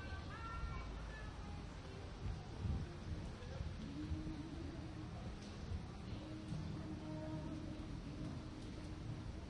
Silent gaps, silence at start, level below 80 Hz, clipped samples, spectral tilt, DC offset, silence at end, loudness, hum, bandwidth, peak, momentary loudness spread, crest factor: none; 0 s; -52 dBFS; under 0.1%; -6.5 dB/octave; under 0.1%; 0 s; -49 LUFS; none; 11 kHz; -32 dBFS; 4 LU; 16 dB